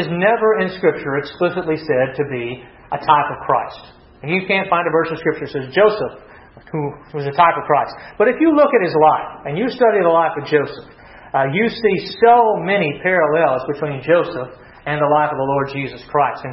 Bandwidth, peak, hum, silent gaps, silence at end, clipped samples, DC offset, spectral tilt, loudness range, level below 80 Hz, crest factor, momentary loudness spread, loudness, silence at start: 6 kHz; 0 dBFS; none; none; 0 s; under 0.1%; under 0.1%; -9 dB/octave; 4 LU; -52 dBFS; 16 dB; 12 LU; -17 LUFS; 0 s